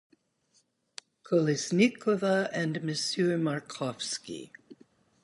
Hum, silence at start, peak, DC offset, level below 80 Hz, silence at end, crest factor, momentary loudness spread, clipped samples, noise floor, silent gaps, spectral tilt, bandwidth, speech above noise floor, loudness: none; 1.25 s; -10 dBFS; under 0.1%; -76 dBFS; 0.5 s; 20 dB; 22 LU; under 0.1%; -71 dBFS; none; -5 dB/octave; 11.5 kHz; 42 dB; -29 LUFS